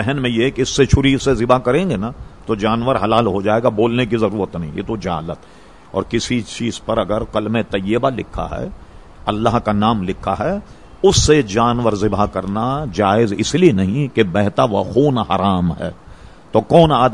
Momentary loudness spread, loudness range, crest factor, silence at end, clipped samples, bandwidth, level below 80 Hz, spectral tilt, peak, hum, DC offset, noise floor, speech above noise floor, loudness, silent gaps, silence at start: 11 LU; 5 LU; 16 dB; 0 s; under 0.1%; 11.5 kHz; -34 dBFS; -5.5 dB/octave; 0 dBFS; none; 0.5%; -40 dBFS; 24 dB; -17 LUFS; none; 0 s